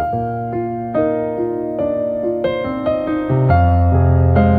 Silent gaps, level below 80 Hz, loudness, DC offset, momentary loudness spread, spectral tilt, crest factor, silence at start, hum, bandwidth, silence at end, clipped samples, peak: none; -30 dBFS; -17 LUFS; under 0.1%; 8 LU; -11 dB/octave; 14 dB; 0 s; none; 4.6 kHz; 0 s; under 0.1%; -2 dBFS